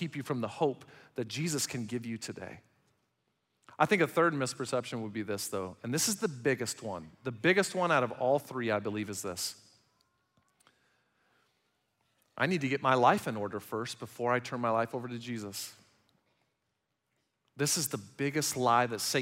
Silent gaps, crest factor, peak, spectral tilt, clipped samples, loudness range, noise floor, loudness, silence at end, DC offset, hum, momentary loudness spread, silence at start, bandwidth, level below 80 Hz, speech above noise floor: none; 24 dB; -10 dBFS; -4 dB/octave; under 0.1%; 8 LU; -82 dBFS; -32 LUFS; 0 s; under 0.1%; none; 13 LU; 0 s; 16 kHz; -78 dBFS; 50 dB